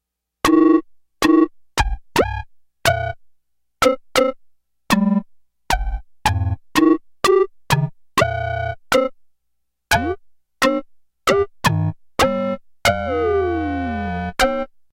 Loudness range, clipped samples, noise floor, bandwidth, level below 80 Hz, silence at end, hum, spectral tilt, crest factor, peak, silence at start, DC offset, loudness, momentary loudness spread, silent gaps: 3 LU; under 0.1%; -74 dBFS; 16 kHz; -34 dBFS; 0.25 s; none; -5 dB/octave; 18 dB; -2 dBFS; 0.45 s; under 0.1%; -19 LUFS; 8 LU; none